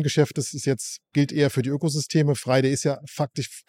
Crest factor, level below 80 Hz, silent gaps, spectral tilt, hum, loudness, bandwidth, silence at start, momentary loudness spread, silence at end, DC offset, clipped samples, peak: 18 dB; -64 dBFS; none; -5.5 dB/octave; none; -24 LUFS; 15.5 kHz; 0 s; 7 LU; 0.1 s; under 0.1%; under 0.1%; -6 dBFS